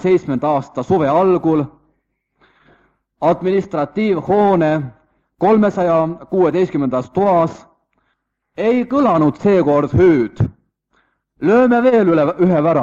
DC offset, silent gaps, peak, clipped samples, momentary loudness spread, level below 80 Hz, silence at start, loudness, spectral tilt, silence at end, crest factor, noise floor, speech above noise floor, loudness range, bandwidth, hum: under 0.1%; none; -2 dBFS; under 0.1%; 8 LU; -48 dBFS; 0 s; -15 LUFS; -9 dB/octave; 0 s; 14 dB; -69 dBFS; 55 dB; 4 LU; 7.4 kHz; none